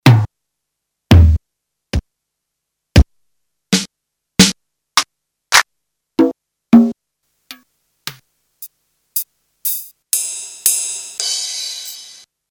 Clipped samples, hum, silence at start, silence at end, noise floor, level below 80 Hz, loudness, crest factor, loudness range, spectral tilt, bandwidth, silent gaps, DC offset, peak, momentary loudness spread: under 0.1%; none; 0.05 s; 0.45 s; -77 dBFS; -26 dBFS; -16 LUFS; 18 dB; 6 LU; -4 dB/octave; over 20 kHz; none; under 0.1%; 0 dBFS; 19 LU